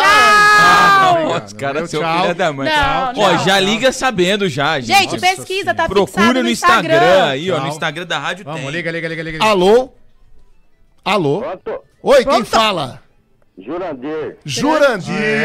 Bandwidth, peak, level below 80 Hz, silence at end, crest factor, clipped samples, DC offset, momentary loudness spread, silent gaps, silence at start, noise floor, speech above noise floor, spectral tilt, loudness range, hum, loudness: 16 kHz; -2 dBFS; -42 dBFS; 0 s; 12 dB; under 0.1%; under 0.1%; 15 LU; none; 0 s; -53 dBFS; 38 dB; -4 dB/octave; 5 LU; none; -13 LUFS